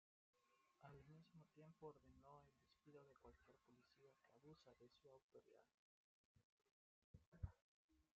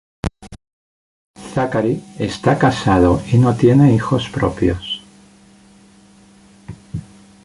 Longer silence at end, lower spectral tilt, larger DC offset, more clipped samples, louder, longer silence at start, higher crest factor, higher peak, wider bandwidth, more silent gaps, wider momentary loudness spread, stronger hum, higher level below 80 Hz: second, 0.1 s vs 0.4 s; about the same, -7 dB/octave vs -7 dB/octave; neither; neither; second, -65 LUFS vs -16 LUFS; about the same, 0.35 s vs 0.25 s; first, 28 dB vs 18 dB; second, -40 dBFS vs 0 dBFS; second, 6.8 kHz vs 11.5 kHz; first, 5.22-5.29 s, 5.74-6.35 s, 6.44-6.58 s, 6.71-7.14 s, 7.27-7.32 s, 7.61-7.89 s vs 0.73-1.34 s; second, 9 LU vs 19 LU; neither; second, -78 dBFS vs -36 dBFS